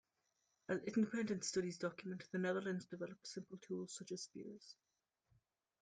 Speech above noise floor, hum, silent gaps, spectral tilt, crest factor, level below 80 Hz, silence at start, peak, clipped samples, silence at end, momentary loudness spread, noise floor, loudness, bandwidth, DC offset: 42 dB; none; none; -5 dB/octave; 18 dB; -84 dBFS; 0.7 s; -28 dBFS; under 0.1%; 1.1 s; 14 LU; -85 dBFS; -44 LUFS; 10 kHz; under 0.1%